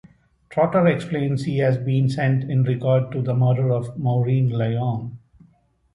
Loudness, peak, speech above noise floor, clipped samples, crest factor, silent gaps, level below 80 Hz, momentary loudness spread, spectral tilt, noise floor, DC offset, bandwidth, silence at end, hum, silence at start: -21 LUFS; -6 dBFS; 39 dB; under 0.1%; 16 dB; none; -56 dBFS; 5 LU; -9 dB/octave; -59 dBFS; under 0.1%; 10.5 kHz; 0.75 s; none; 0.5 s